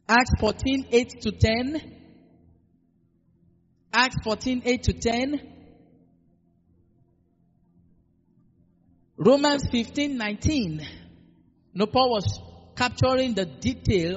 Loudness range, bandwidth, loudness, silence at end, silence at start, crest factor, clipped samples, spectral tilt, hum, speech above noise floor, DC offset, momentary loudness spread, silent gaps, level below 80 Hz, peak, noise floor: 5 LU; 8 kHz; -24 LUFS; 0 s; 0.1 s; 22 dB; under 0.1%; -4 dB/octave; none; 42 dB; under 0.1%; 11 LU; none; -44 dBFS; -6 dBFS; -65 dBFS